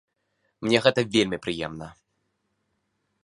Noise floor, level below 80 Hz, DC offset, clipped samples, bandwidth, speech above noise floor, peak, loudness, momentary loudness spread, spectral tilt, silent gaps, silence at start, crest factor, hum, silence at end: -75 dBFS; -58 dBFS; under 0.1%; under 0.1%; 11.5 kHz; 51 dB; -2 dBFS; -24 LUFS; 17 LU; -4.5 dB/octave; none; 0.6 s; 26 dB; none; 1.3 s